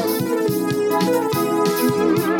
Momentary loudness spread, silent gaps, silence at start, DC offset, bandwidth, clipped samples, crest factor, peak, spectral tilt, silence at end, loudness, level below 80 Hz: 2 LU; none; 0 s; under 0.1%; 18 kHz; under 0.1%; 12 dB; -8 dBFS; -5.5 dB/octave; 0 s; -19 LUFS; -56 dBFS